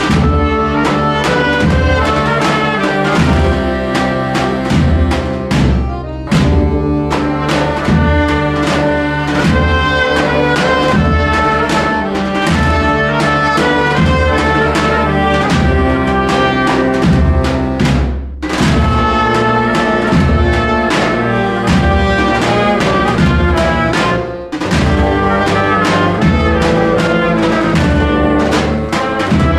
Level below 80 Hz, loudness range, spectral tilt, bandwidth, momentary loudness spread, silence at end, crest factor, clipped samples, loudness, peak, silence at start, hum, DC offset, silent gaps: -20 dBFS; 2 LU; -6 dB/octave; 12.5 kHz; 3 LU; 0 s; 10 dB; under 0.1%; -12 LUFS; -2 dBFS; 0 s; none; under 0.1%; none